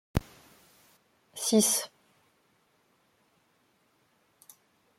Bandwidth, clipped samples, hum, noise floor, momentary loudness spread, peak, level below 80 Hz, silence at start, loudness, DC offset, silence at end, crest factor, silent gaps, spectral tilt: 16.5 kHz; under 0.1%; none; -70 dBFS; 20 LU; -10 dBFS; -52 dBFS; 0.15 s; -27 LUFS; under 0.1%; 3.1 s; 26 dB; none; -3.5 dB/octave